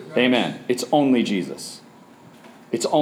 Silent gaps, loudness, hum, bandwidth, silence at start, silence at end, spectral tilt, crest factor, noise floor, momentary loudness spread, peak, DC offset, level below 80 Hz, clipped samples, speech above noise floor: none; -21 LUFS; none; 15.5 kHz; 0 s; 0 s; -4.5 dB/octave; 18 dB; -47 dBFS; 16 LU; -4 dBFS; under 0.1%; -76 dBFS; under 0.1%; 27 dB